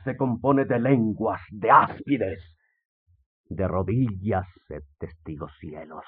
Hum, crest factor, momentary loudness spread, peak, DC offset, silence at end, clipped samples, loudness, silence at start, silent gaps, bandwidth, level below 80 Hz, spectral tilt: none; 20 dB; 21 LU; -4 dBFS; under 0.1%; 0.05 s; under 0.1%; -24 LUFS; 0 s; 2.85-3.06 s, 3.26-3.44 s; 4.4 kHz; -56 dBFS; -7.5 dB/octave